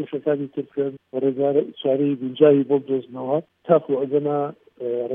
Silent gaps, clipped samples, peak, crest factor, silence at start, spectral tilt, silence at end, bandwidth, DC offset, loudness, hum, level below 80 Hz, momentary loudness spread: none; under 0.1%; -2 dBFS; 20 dB; 0 s; -11 dB/octave; 0 s; 3.7 kHz; under 0.1%; -22 LUFS; none; -78 dBFS; 10 LU